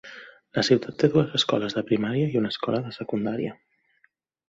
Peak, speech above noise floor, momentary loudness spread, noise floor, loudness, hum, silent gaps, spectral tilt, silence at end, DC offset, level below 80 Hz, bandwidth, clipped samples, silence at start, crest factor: -4 dBFS; 43 dB; 10 LU; -67 dBFS; -25 LUFS; none; none; -6 dB/octave; 0.95 s; under 0.1%; -62 dBFS; 8 kHz; under 0.1%; 0.05 s; 22 dB